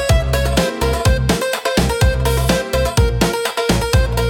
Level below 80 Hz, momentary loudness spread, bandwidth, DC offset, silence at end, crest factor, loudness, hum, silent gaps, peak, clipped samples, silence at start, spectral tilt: -20 dBFS; 2 LU; 17.5 kHz; under 0.1%; 0 s; 14 dB; -16 LUFS; none; none; -2 dBFS; under 0.1%; 0 s; -5 dB/octave